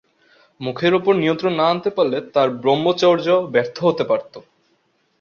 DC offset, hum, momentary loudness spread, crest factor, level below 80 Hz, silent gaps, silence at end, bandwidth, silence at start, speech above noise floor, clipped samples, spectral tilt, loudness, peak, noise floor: under 0.1%; none; 5 LU; 16 dB; -62 dBFS; none; 0.8 s; 7 kHz; 0.6 s; 46 dB; under 0.1%; -6.5 dB/octave; -18 LUFS; -2 dBFS; -64 dBFS